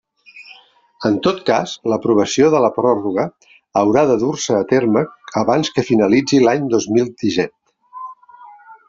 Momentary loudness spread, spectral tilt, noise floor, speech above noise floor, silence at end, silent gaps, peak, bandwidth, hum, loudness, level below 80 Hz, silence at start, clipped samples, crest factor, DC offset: 9 LU; -5.5 dB/octave; -47 dBFS; 32 dB; 0.15 s; none; -2 dBFS; 7.8 kHz; none; -16 LUFS; -56 dBFS; 0.35 s; under 0.1%; 16 dB; under 0.1%